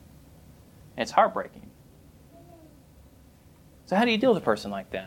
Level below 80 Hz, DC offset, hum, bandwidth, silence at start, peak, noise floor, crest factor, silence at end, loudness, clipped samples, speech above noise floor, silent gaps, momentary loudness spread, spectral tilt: -58 dBFS; under 0.1%; none; 17.5 kHz; 0.95 s; -6 dBFS; -54 dBFS; 24 dB; 0 s; -25 LUFS; under 0.1%; 29 dB; none; 14 LU; -5.5 dB/octave